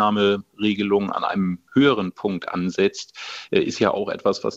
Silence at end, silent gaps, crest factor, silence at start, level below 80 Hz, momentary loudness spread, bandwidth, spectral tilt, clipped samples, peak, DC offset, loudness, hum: 0 s; none; 18 dB; 0 s; -60 dBFS; 7 LU; 8 kHz; -5.5 dB/octave; under 0.1%; -2 dBFS; under 0.1%; -22 LUFS; none